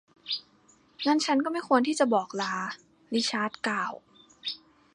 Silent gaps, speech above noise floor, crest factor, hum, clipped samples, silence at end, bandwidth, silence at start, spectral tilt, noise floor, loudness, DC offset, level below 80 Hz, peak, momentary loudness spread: none; 35 dB; 20 dB; none; under 0.1%; 0.4 s; 11.5 kHz; 0.25 s; -3 dB/octave; -62 dBFS; -28 LUFS; under 0.1%; -78 dBFS; -8 dBFS; 12 LU